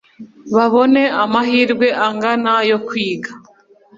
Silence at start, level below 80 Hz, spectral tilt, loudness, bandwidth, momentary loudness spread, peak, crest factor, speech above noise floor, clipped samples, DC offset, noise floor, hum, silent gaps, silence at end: 0.2 s; -62 dBFS; -5.5 dB/octave; -15 LUFS; 7.6 kHz; 8 LU; -2 dBFS; 14 dB; 34 dB; under 0.1%; under 0.1%; -49 dBFS; none; none; 0.6 s